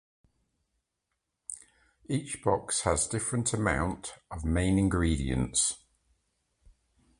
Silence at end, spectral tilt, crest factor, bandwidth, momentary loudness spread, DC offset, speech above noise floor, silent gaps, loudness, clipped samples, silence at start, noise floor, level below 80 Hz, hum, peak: 1.4 s; -4.5 dB/octave; 22 dB; 11.5 kHz; 16 LU; under 0.1%; 54 dB; none; -29 LUFS; under 0.1%; 1.5 s; -83 dBFS; -42 dBFS; none; -10 dBFS